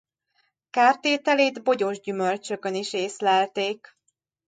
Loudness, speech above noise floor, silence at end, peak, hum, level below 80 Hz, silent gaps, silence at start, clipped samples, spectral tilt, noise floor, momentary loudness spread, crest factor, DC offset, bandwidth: -24 LUFS; 47 dB; 0.75 s; -4 dBFS; none; -78 dBFS; none; 0.75 s; under 0.1%; -3.5 dB/octave; -71 dBFS; 9 LU; 20 dB; under 0.1%; 9.4 kHz